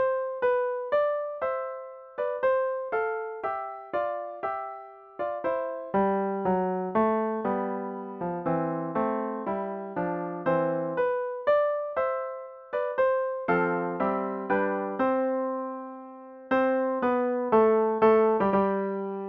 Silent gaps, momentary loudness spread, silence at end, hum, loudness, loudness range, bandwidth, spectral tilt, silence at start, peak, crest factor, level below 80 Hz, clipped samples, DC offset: none; 11 LU; 0 s; none; -28 LUFS; 5 LU; 5 kHz; -9.5 dB/octave; 0 s; -10 dBFS; 16 dB; -64 dBFS; under 0.1%; under 0.1%